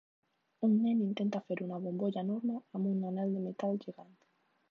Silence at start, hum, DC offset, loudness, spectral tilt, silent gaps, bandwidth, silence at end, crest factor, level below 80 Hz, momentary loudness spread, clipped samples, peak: 0.6 s; none; under 0.1%; -35 LUFS; -9 dB/octave; none; 6.4 kHz; 0.7 s; 14 dB; under -90 dBFS; 8 LU; under 0.1%; -20 dBFS